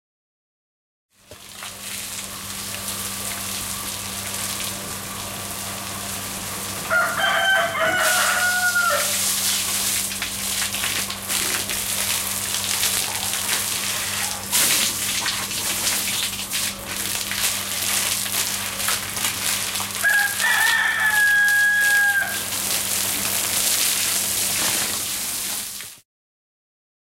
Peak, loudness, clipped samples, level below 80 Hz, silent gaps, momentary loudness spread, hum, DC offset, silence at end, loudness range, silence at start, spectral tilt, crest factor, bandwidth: -4 dBFS; -20 LUFS; under 0.1%; -52 dBFS; none; 11 LU; none; under 0.1%; 1.1 s; 9 LU; 1.3 s; 0 dB/octave; 20 dB; 17 kHz